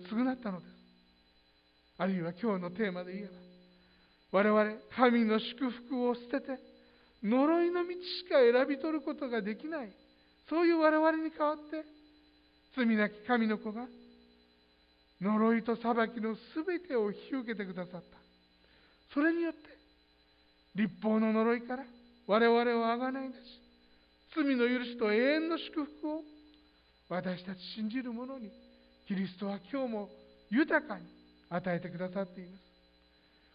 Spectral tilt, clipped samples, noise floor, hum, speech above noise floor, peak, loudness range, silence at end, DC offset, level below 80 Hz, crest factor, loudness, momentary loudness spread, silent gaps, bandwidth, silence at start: -9.5 dB/octave; under 0.1%; -68 dBFS; none; 36 dB; -12 dBFS; 8 LU; 1 s; under 0.1%; -74 dBFS; 22 dB; -33 LUFS; 17 LU; none; 5.2 kHz; 0 s